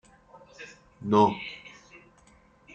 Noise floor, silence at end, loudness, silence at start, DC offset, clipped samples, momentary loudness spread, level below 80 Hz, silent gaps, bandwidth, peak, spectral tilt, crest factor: -59 dBFS; 1.05 s; -25 LUFS; 0.6 s; under 0.1%; under 0.1%; 24 LU; -66 dBFS; none; 8.6 kHz; -8 dBFS; -6.5 dB/octave; 22 dB